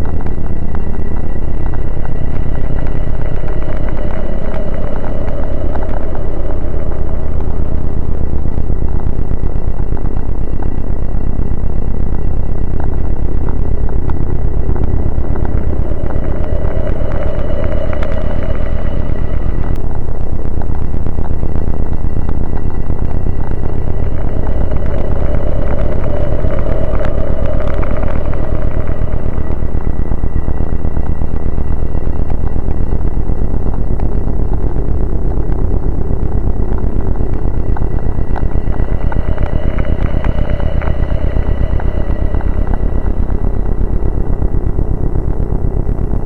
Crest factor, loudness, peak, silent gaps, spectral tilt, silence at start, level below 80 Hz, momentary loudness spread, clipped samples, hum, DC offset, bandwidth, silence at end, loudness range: 8 dB; -19 LUFS; 0 dBFS; none; -10 dB/octave; 0 s; -16 dBFS; 3 LU; 0.3%; none; under 0.1%; 3.1 kHz; 0 s; 3 LU